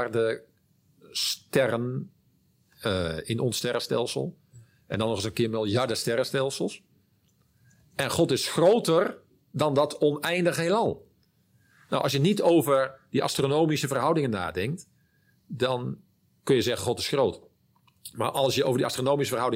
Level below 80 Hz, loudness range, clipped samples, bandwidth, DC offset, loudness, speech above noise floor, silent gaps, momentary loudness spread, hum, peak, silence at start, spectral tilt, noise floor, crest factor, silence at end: -64 dBFS; 4 LU; under 0.1%; 16 kHz; under 0.1%; -26 LUFS; 41 dB; none; 13 LU; none; -8 dBFS; 0 s; -5 dB/octave; -66 dBFS; 18 dB; 0 s